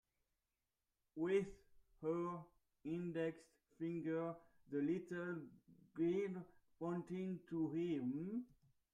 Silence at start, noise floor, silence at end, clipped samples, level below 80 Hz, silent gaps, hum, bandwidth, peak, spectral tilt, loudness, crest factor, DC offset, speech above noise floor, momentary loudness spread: 1.15 s; under -90 dBFS; 0.45 s; under 0.1%; -78 dBFS; none; none; 9.8 kHz; -28 dBFS; -8.5 dB/octave; -44 LUFS; 18 dB; under 0.1%; over 47 dB; 15 LU